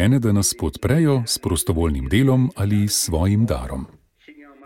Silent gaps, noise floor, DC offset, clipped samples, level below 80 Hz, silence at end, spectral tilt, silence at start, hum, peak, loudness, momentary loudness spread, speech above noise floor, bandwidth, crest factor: none; -47 dBFS; under 0.1%; under 0.1%; -34 dBFS; 0.2 s; -5 dB/octave; 0 s; none; -4 dBFS; -19 LUFS; 7 LU; 28 dB; 17 kHz; 14 dB